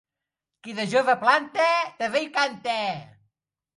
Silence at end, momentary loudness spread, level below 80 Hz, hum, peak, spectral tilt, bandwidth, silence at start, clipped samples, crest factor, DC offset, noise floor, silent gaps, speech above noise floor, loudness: 0.75 s; 13 LU; -74 dBFS; none; -4 dBFS; -3.5 dB/octave; 11.5 kHz; 0.65 s; under 0.1%; 20 dB; under 0.1%; -86 dBFS; none; 63 dB; -23 LUFS